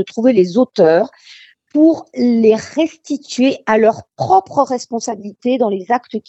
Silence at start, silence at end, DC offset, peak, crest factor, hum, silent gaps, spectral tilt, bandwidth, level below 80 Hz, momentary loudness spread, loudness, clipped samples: 0 s; 0.1 s; under 0.1%; 0 dBFS; 14 dB; none; none; -5.5 dB/octave; 8.2 kHz; -62 dBFS; 10 LU; -15 LUFS; under 0.1%